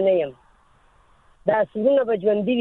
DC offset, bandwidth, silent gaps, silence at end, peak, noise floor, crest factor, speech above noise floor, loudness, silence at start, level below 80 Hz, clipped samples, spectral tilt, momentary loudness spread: under 0.1%; 4.1 kHz; none; 0 s; -6 dBFS; -57 dBFS; 16 dB; 37 dB; -22 LUFS; 0 s; -60 dBFS; under 0.1%; -9 dB/octave; 7 LU